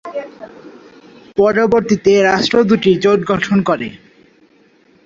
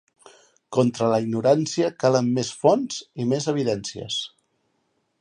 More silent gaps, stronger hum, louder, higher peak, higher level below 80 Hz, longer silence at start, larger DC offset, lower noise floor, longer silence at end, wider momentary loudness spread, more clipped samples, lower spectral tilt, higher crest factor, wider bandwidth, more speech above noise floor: neither; neither; first, -13 LUFS vs -23 LUFS; first, 0 dBFS vs -4 dBFS; first, -50 dBFS vs -64 dBFS; second, 0.05 s vs 0.7 s; neither; second, -51 dBFS vs -71 dBFS; first, 1.1 s vs 0.95 s; first, 16 LU vs 8 LU; neither; about the same, -6 dB/octave vs -5.5 dB/octave; second, 14 dB vs 20 dB; second, 7.6 kHz vs 10.5 kHz; second, 39 dB vs 49 dB